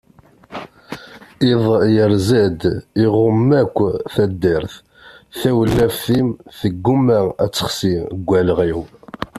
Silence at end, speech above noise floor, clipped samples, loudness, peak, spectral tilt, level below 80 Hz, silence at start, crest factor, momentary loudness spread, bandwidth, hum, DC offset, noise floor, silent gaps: 0 s; 31 dB; under 0.1%; -17 LUFS; -2 dBFS; -6.5 dB/octave; -44 dBFS; 0.5 s; 14 dB; 19 LU; 14.5 kHz; none; under 0.1%; -47 dBFS; none